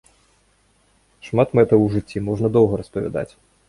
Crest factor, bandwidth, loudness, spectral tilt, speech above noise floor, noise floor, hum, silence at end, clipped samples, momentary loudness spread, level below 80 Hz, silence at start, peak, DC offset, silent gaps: 18 dB; 11 kHz; -19 LUFS; -9 dB/octave; 42 dB; -60 dBFS; none; 0.4 s; under 0.1%; 11 LU; -48 dBFS; 1.25 s; -2 dBFS; under 0.1%; none